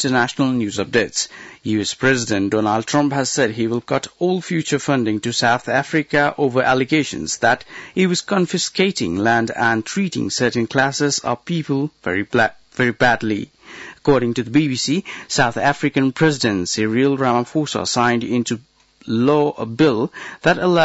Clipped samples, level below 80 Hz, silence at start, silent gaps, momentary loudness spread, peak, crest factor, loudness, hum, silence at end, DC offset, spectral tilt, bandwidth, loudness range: under 0.1%; -54 dBFS; 0 s; none; 6 LU; -4 dBFS; 14 dB; -19 LUFS; none; 0 s; under 0.1%; -4.5 dB/octave; 8 kHz; 1 LU